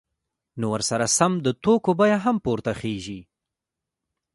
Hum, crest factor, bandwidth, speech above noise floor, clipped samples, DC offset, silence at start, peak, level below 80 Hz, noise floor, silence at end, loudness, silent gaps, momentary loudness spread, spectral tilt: none; 20 dB; 12 kHz; 64 dB; under 0.1%; under 0.1%; 0.55 s; -4 dBFS; -56 dBFS; -86 dBFS; 1.15 s; -22 LUFS; none; 13 LU; -4.5 dB/octave